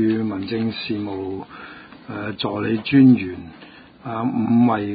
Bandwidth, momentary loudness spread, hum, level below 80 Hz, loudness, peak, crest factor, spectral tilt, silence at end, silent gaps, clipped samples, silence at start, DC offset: 5 kHz; 23 LU; none; -54 dBFS; -20 LUFS; -4 dBFS; 18 dB; -12 dB/octave; 0 s; none; under 0.1%; 0 s; under 0.1%